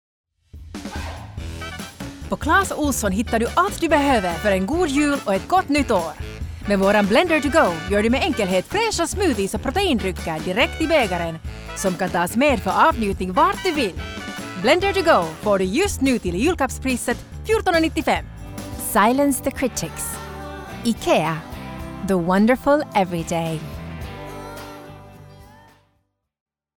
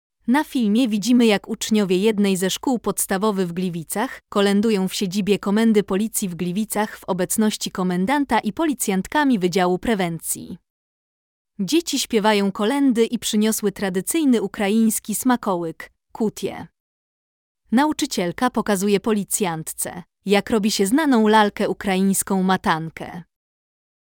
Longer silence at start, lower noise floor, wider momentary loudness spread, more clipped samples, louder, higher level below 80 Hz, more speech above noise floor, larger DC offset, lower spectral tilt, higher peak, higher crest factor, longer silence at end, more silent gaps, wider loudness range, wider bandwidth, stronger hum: first, 0.55 s vs 0.25 s; second, -69 dBFS vs under -90 dBFS; first, 16 LU vs 8 LU; neither; about the same, -20 LUFS vs -20 LUFS; first, -38 dBFS vs -54 dBFS; second, 50 dB vs over 70 dB; neither; about the same, -4.5 dB/octave vs -4.5 dB/octave; about the same, -4 dBFS vs -4 dBFS; about the same, 18 dB vs 16 dB; first, 1.35 s vs 0.85 s; second, none vs 10.70-11.45 s, 16.80-17.55 s; about the same, 4 LU vs 3 LU; about the same, over 20 kHz vs 19 kHz; neither